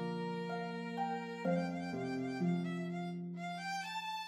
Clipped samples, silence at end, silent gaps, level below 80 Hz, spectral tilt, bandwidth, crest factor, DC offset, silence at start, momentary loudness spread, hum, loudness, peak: under 0.1%; 0 s; none; -82 dBFS; -6.5 dB/octave; 12 kHz; 16 dB; under 0.1%; 0 s; 6 LU; none; -39 LUFS; -22 dBFS